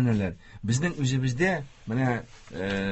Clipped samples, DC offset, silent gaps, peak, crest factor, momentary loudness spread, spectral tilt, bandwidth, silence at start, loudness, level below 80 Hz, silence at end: under 0.1%; under 0.1%; none; -10 dBFS; 16 dB; 9 LU; -6 dB/octave; 8.6 kHz; 0 s; -28 LUFS; -50 dBFS; 0 s